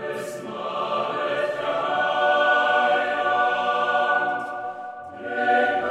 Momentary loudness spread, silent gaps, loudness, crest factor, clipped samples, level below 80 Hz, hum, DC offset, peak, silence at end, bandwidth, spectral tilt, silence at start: 13 LU; none; -22 LUFS; 16 dB; under 0.1%; -76 dBFS; none; under 0.1%; -8 dBFS; 0 s; 13 kHz; -3.5 dB/octave; 0 s